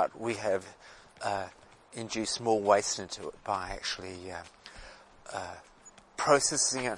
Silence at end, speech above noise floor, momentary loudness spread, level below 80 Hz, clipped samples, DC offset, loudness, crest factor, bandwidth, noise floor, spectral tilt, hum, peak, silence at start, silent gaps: 0 s; 20 dB; 23 LU; -60 dBFS; under 0.1%; under 0.1%; -31 LUFS; 24 dB; 11.5 kHz; -51 dBFS; -2.5 dB/octave; none; -8 dBFS; 0 s; none